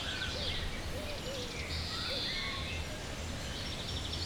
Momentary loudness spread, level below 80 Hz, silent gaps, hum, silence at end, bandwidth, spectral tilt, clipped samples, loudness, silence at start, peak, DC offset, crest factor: 6 LU; -44 dBFS; none; none; 0 s; over 20 kHz; -3.5 dB/octave; under 0.1%; -37 LUFS; 0 s; -22 dBFS; under 0.1%; 16 dB